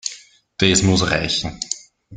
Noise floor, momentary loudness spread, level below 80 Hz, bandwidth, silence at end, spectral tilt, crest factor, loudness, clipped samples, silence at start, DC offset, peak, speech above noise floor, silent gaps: -43 dBFS; 14 LU; -42 dBFS; 9.8 kHz; 0 s; -3.5 dB/octave; 20 dB; -18 LUFS; under 0.1%; 0.05 s; under 0.1%; -2 dBFS; 25 dB; none